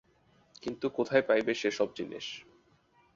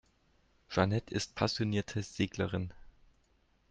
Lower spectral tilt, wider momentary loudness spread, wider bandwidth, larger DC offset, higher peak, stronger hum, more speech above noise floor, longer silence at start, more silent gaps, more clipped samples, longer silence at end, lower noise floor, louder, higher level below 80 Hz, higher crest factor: about the same, -4.5 dB/octave vs -5.5 dB/octave; first, 15 LU vs 8 LU; second, 7.6 kHz vs 9.2 kHz; neither; about the same, -12 dBFS vs -14 dBFS; neither; about the same, 36 dB vs 38 dB; about the same, 0.65 s vs 0.7 s; neither; neither; about the same, 0.75 s vs 0.8 s; second, -66 dBFS vs -71 dBFS; first, -31 LUFS vs -34 LUFS; second, -70 dBFS vs -60 dBFS; about the same, 22 dB vs 22 dB